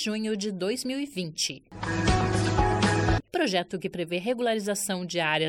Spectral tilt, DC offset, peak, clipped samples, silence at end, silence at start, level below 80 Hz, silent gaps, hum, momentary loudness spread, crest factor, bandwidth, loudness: -4.5 dB/octave; under 0.1%; -10 dBFS; under 0.1%; 0 s; 0 s; -40 dBFS; none; none; 8 LU; 16 dB; 17 kHz; -27 LUFS